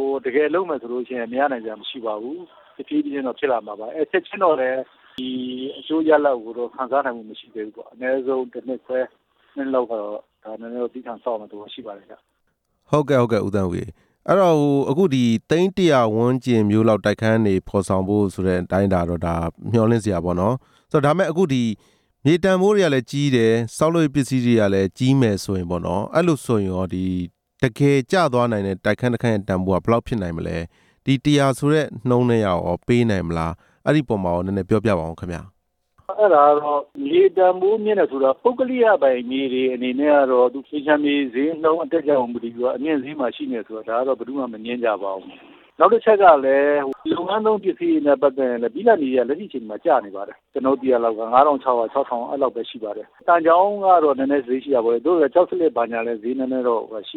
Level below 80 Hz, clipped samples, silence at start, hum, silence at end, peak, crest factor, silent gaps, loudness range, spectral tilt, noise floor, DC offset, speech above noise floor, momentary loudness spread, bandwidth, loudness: -50 dBFS; under 0.1%; 0 s; none; 0 s; -2 dBFS; 18 dB; none; 7 LU; -7 dB/octave; -70 dBFS; under 0.1%; 50 dB; 13 LU; 14 kHz; -20 LUFS